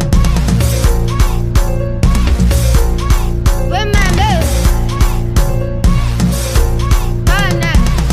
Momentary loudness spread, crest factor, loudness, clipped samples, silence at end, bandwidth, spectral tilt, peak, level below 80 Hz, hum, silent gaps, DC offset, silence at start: 3 LU; 10 dB; -14 LUFS; under 0.1%; 0 s; 15.5 kHz; -5.5 dB/octave; 0 dBFS; -12 dBFS; none; none; under 0.1%; 0 s